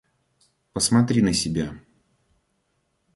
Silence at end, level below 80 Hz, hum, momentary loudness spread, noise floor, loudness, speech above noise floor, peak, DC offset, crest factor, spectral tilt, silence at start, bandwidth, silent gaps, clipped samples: 1.35 s; -50 dBFS; none; 14 LU; -72 dBFS; -22 LUFS; 51 dB; -8 dBFS; under 0.1%; 18 dB; -4.5 dB/octave; 0.75 s; 11.5 kHz; none; under 0.1%